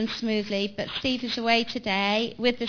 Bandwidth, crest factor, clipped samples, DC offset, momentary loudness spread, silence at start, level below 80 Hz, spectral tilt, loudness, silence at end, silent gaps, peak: 5.4 kHz; 20 dB; under 0.1%; under 0.1%; 5 LU; 0 s; -58 dBFS; -4.5 dB/octave; -26 LUFS; 0 s; none; -8 dBFS